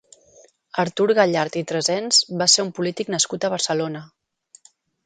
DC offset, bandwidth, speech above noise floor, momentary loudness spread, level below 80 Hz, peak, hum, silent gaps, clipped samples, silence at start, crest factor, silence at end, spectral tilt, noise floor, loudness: under 0.1%; 11 kHz; 34 dB; 10 LU; -68 dBFS; -2 dBFS; none; none; under 0.1%; 0.75 s; 20 dB; 1 s; -2.5 dB/octave; -55 dBFS; -20 LUFS